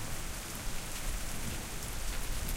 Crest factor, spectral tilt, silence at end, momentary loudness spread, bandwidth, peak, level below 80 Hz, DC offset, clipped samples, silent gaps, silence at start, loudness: 14 dB; -3 dB/octave; 0 s; 1 LU; 17 kHz; -22 dBFS; -38 dBFS; 0.1%; under 0.1%; none; 0 s; -39 LUFS